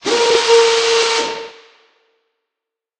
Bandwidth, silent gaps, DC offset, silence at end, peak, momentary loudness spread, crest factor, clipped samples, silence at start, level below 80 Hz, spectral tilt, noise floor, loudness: 10 kHz; none; under 0.1%; 1.5 s; 0 dBFS; 16 LU; 16 dB; under 0.1%; 0.05 s; -60 dBFS; 0 dB/octave; -84 dBFS; -13 LUFS